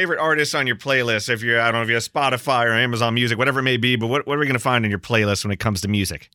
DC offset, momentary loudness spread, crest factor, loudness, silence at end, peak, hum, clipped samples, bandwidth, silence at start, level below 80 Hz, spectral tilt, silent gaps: under 0.1%; 4 LU; 18 dB; -19 LUFS; 0.15 s; -2 dBFS; none; under 0.1%; 19 kHz; 0 s; -54 dBFS; -4.5 dB/octave; none